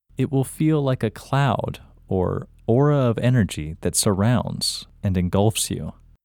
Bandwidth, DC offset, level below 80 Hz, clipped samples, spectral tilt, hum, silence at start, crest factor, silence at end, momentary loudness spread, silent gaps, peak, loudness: 18 kHz; under 0.1%; -46 dBFS; under 0.1%; -5.5 dB/octave; none; 0.2 s; 16 dB; 0.35 s; 9 LU; none; -4 dBFS; -22 LUFS